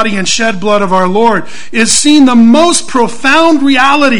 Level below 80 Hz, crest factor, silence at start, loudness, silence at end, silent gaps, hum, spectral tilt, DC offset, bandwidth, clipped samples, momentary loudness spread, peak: -42 dBFS; 8 dB; 0 s; -8 LUFS; 0 s; none; none; -3 dB/octave; 10%; 11 kHz; 2%; 6 LU; 0 dBFS